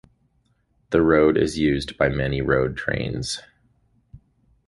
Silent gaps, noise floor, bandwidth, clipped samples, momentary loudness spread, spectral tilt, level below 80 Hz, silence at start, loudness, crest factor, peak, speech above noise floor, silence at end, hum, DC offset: none; -66 dBFS; 11.5 kHz; under 0.1%; 10 LU; -6 dB/octave; -42 dBFS; 0.9 s; -22 LUFS; 20 dB; -4 dBFS; 45 dB; 0.5 s; none; under 0.1%